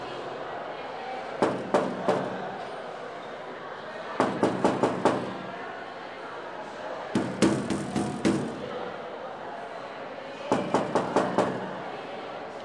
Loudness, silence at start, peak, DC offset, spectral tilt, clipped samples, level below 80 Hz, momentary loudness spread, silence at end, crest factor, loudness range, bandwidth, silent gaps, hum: -30 LUFS; 0 s; -8 dBFS; under 0.1%; -5.5 dB/octave; under 0.1%; -64 dBFS; 13 LU; 0 s; 22 dB; 2 LU; 11.5 kHz; none; none